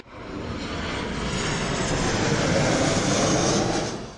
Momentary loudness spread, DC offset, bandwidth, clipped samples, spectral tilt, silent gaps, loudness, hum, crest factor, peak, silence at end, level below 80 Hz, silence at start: 10 LU; under 0.1%; 11.5 kHz; under 0.1%; -4 dB/octave; none; -24 LUFS; none; 16 dB; -10 dBFS; 0 s; -40 dBFS; 0.05 s